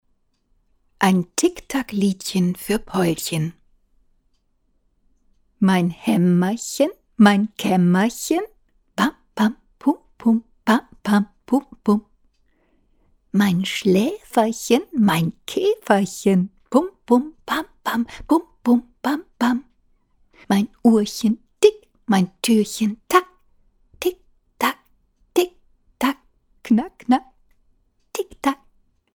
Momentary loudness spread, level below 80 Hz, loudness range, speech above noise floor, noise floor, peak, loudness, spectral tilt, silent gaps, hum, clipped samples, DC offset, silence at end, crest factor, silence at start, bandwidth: 8 LU; -54 dBFS; 5 LU; 46 dB; -65 dBFS; -2 dBFS; -21 LUFS; -5.5 dB/octave; none; none; under 0.1%; under 0.1%; 0.6 s; 20 dB; 1 s; 19 kHz